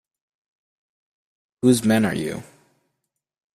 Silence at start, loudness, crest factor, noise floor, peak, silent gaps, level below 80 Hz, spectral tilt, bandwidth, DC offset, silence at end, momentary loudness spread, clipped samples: 1.65 s; -20 LUFS; 20 dB; -79 dBFS; -4 dBFS; none; -58 dBFS; -5.5 dB/octave; 15 kHz; under 0.1%; 1.1 s; 13 LU; under 0.1%